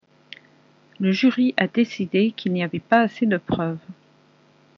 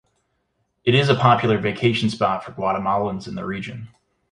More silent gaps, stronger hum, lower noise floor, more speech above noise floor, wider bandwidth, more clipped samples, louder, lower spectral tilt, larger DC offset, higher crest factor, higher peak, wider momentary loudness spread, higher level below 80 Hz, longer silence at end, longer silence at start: neither; neither; second, -56 dBFS vs -71 dBFS; second, 35 dB vs 51 dB; second, 6.8 kHz vs 11 kHz; neither; about the same, -21 LUFS vs -20 LUFS; second, -5 dB/octave vs -6.5 dB/octave; neither; about the same, 20 dB vs 20 dB; about the same, -2 dBFS vs -2 dBFS; second, 7 LU vs 13 LU; about the same, -58 dBFS vs -54 dBFS; first, 0.85 s vs 0.45 s; first, 1 s vs 0.85 s